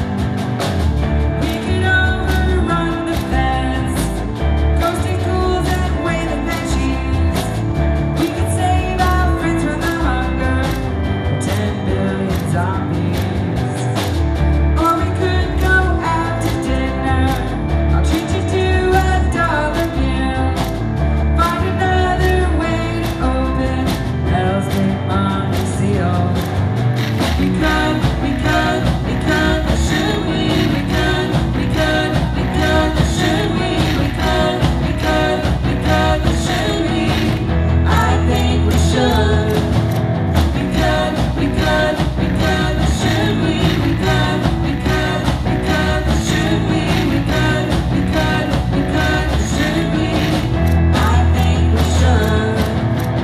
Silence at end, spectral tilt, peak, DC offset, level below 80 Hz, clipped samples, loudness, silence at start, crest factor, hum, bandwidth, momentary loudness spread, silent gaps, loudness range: 0 s; -6 dB/octave; 0 dBFS; under 0.1%; -22 dBFS; under 0.1%; -16 LUFS; 0 s; 14 dB; none; 14 kHz; 4 LU; none; 3 LU